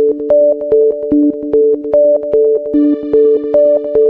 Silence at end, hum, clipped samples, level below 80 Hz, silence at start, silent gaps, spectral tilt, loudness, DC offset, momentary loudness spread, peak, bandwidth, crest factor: 0 s; none; under 0.1%; -46 dBFS; 0 s; none; -10.5 dB/octave; -11 LUFS; under 0.1%; 2 LU; -2 dBFS; 3.1 kHz; 10 dB